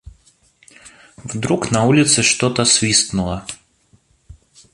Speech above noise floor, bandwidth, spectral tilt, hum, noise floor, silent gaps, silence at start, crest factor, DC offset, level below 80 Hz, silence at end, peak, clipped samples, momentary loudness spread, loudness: 40 dB; 11.5 kHz; -3 dB/octave; none; -57 dBFS; none; 0.05 s; 18 dB; under 0.1%; -44 dBFS; 0.4 s; 0 dBFS; under 0.1%; 19 LU; -15 LUFS